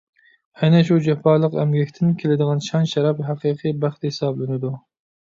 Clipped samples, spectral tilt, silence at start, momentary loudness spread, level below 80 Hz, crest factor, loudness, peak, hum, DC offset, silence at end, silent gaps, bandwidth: under 0.1%; -7.5 dB/octave; 0.6 s; 8 LU; -62 dBFS; 16 dB; -20 LUFS; -4 dBFS; none; under 0.1%; 0.45 s; none; 7.6 kHz